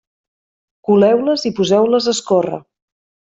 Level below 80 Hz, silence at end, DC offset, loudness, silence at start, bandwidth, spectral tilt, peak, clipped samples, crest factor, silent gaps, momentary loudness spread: -60 dBFS; 0.8 s; under 0.1%; -15 LUFS; 0.9 s; 8 kHz; -5 dB/octave; -2 dBFS; under 0.1%; 14 dB; none; 12 LU